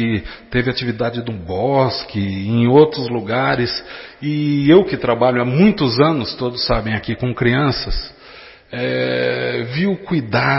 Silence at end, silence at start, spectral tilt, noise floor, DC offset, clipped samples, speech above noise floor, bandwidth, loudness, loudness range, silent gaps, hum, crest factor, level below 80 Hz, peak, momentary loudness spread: 0 s; 0 s; -10 dB/octave; -41 dBFS; under 0.1%; under 0.1%; 24 dB; 6 kHz; -17 LUFS; 4 LU; none; none; 16 dB; -36 dBFS; 0 dBFS; 12 LU